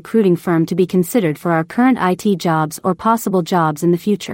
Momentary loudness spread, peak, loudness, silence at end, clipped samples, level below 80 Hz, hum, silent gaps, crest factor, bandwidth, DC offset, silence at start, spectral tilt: 3 LU; -2 dBFS; -16 LUFS; 0 s; under 0.1%; -58 dBFS; none; none; 14 dB; 16.5 kHz; under 0.1%; 0.05 s; -6.5 dB/octave